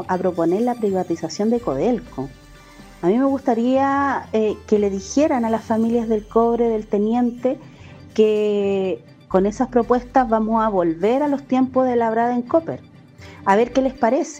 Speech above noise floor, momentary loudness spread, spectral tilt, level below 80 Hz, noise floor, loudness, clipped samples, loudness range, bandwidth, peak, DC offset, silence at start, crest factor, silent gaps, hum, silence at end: 24 dB; 7 LU; -6.5 dB/octave; -48 dBFS; -43 dBFS; -20 LUFS; under 0.1%; 2 LU; 9.6 kHz; -2 dBFS; under 0.1%; 0 s; 18 dB; none; none; 0 s